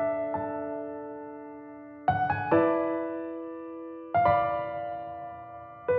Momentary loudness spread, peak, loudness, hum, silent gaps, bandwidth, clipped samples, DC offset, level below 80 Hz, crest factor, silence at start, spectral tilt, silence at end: 18 LU; -12 dBFS; -29 LUFS; none; none; 4.9 kHz; under 0.1%; under 0.1%; -60 dBFS; 18 dB; 0 s; -6 dB/octave; 0 s